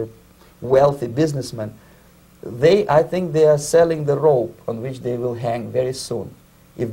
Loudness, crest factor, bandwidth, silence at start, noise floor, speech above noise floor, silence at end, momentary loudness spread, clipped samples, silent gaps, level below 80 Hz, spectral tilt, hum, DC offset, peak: -19 LUFS; 18 dB; 16 kHz; 0 s; -49 dBFS; 31 dB; 0 s; 16 LU; under 0.1%; none; -52 dBFS; -6 dB/octave; none; under 0.1%; -2 dBFS